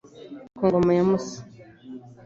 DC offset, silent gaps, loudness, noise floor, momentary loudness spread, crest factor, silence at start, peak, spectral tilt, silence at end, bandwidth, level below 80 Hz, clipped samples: under 0.1%; none; -22 LUFS; -43 dBFS; 23 LU; 18 dB; 0.15 s; -8 dBFS; -7.5 dB/octave; 0.15 s; 7.6 kHz; -56 dBFS; under 0.1%